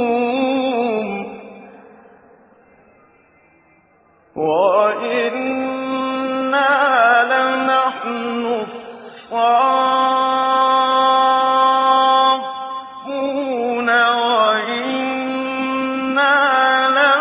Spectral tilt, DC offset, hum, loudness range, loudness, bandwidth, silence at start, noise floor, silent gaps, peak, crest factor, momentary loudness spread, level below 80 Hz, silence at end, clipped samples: -7 dB/octave; under 0.1%; none; 8 LU; -16 LUFS; 4 kHz; 0 s; -54 dBFS; none; -2 dBFS; 16 dB; 12 LU; -66 dBFS; 0 s; under 0.1%